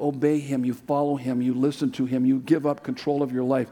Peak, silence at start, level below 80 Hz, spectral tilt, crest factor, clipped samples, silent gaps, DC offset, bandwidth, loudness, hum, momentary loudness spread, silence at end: -8 dBFS; 0 s; -68 dBFS; -7.5 dB/octave; 16 dB; under 0.1%; none; under 0.1%; 12.5 kHz; -25 LUFS; none; 5 LU; 0 s